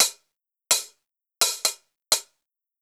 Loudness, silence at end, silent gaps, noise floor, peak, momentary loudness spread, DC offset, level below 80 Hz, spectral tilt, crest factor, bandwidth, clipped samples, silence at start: -23 LUFS; 0.6 s; none; -80 dBFS; 0 dBFS; 11 LU; under 0.1%; -78 dBFS; 3 dB/octave; 28 dB; over 20 kHz; under 0.1%; 0 s